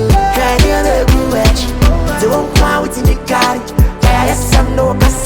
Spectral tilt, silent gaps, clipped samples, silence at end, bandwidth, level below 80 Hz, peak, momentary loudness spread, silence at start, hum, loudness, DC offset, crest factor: -5 dB/octave; none; under 0.1%; 0 s; 19.5 kHz; -14 dBFS; 0 dBFS; 3 LU; 0 s; none; -12 LUFS; under 0.1%; 10 dB